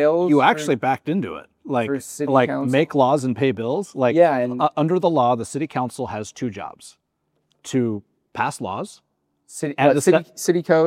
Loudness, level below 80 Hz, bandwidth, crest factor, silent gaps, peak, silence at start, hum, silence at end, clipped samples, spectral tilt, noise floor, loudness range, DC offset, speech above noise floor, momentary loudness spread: -20 LUFS; -68 dBFS; 16 kHz; 20 dB; none; 0 dBFS; 0 s; none; 0 s; under 0.1%; -6 dB/octave; -71 dBFS; 9 LU; under 0.1%; 52 dB; 14 LU